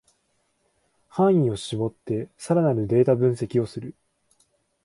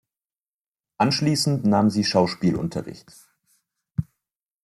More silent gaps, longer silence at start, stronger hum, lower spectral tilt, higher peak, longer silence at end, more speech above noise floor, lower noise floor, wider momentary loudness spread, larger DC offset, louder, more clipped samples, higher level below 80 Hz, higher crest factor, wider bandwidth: neither; first, 1.15 s vs 1 s; neither; first, -8 dB/octave vs -5.5 dB/octave; about the same, -8 dBFS vs -6 dBFS; first, 0.95 s vs 0.6 s; second, 48 dB vs over 68 dB; second, -70 dBFS vs under -90 dBFS; about the same, 13 LU vs 12 LU; neither; about the same, -23 LUFS vs -22 LUFS; neither; about the same, -58 dBFS vs -56 dBFS; about the same, 18 dB vs 18 dB; second, 11.5 kHz vs 14 kHz